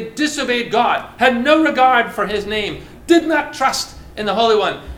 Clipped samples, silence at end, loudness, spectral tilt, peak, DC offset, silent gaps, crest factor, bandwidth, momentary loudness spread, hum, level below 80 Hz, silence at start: under 0.1%; 0 s; -16 LUFS; -3.5 dB/octave; 0 dBFS; under 0.1%; none; 16 dB; 16.5 kHz; 10 LU; none; -42 dBFS; 0 s